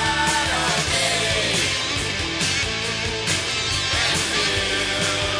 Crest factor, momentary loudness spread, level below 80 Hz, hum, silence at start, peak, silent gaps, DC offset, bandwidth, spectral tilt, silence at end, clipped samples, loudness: 14 dB; 3 LU; -40 dBFS; none; 0 s; -8 dBFS; none; under 0.1%; 11 kHz; -2 dB/octave; 0 s; under 0.1%; -20 LUFS